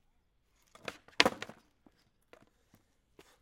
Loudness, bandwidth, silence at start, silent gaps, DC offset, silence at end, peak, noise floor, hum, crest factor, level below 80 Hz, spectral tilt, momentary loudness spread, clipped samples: -30 LUFS; 16.5 kHz; 0.9 s; none; under 0.1%; 1.95 s; -2 dBFS; -73 dBFS; none; 38 dB; -70 dBFS; -2 dB/octave; 18 LU; under 0.1%